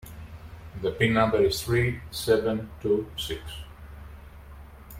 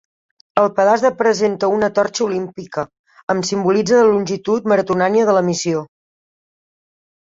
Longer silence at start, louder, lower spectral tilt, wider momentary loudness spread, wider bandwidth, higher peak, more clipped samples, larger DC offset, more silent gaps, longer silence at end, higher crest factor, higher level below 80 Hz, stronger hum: second, 0.05 s vs 0.55 s; second, -26 LUFS vs -17 LUFS; about the same, -5.5 dB/octave vs -5 dB/octave; first, 24 LU vs 11 LU; first, 16.5 kHz vs 7.8 kHz; second, -8 dBFS vs -2 dBFS; neither; neither; second, none vs 2.99-3.04 s, 3.23-3.27 s; second, 0 s vs 1.4 s; about the same, 20 dB vs 16 dB; first, -46 dBFS vs -58 dBFS; neither